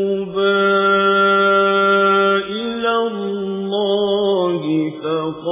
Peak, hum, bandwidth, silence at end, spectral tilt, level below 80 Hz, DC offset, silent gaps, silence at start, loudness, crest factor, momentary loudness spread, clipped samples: -4 dBFS; none; 3.8 kHz; 0 s; -9 dB/octave; -60 dBFS; under 0.1%; none; 0 s; -16 LUFS; 12 dB; 9 LU; under 0.1%